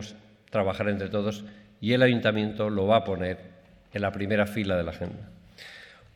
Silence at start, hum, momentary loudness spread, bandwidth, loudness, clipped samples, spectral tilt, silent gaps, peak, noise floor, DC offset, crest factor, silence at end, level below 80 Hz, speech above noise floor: 0 s; none; 22 LU; 14.5 kHz; -27 LUFS; under 0.1%; -7 dB/octave; none; -8 dBFS; -48 dBFS; under 0.1%; 20 dB; 0.3 s; -56 dBFS; 22 dB